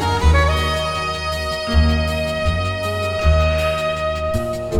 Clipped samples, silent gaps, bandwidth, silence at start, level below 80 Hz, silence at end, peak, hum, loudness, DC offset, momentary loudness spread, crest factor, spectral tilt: under 0.1%; none; 14.5 kHz; 0 s; -22 dBFS; 0 s; -4 dBFS; none; -19 LUFS; under 0.1%; 6 LU; 14 dB; -5.5 dB/octave